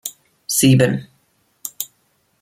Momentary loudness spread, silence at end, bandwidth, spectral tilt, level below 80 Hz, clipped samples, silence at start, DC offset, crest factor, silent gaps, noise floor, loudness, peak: 19 LU; 0.55 s; 16.5 kHz; -5 dB/octave; -56 dBFS; under 0.1%; 0.05 s; under 0.1%; 18 dB; none; -63 dBFS; -17 LUFS; -2 dBFS